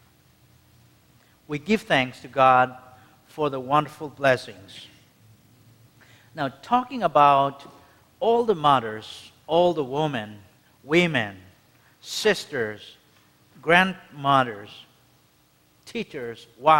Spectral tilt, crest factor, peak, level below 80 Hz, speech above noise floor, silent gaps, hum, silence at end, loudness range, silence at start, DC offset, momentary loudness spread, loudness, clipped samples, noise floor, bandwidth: -5 dB/octave; 24 dB; 0 dBFS; -62 dBFS; 38 dB; none; none; 0 s; 6 LU; 1.5 s; under 0.1%; 22 LU; -23 LUFS; under 0.1%; -61 dBFS; 16.5 kHz